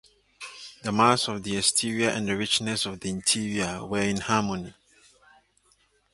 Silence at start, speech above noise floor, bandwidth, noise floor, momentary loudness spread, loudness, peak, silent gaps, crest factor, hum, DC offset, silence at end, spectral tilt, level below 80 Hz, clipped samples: 0.4 s; 39 dB; 11.5 kHz; -65 dBFS; 16 LU; -25 LUFS; -4 dBFS; none; 24 dB; none; under 0.1%; 1.45 s; -3 dB/octave; -58 dBFS; under 0.1%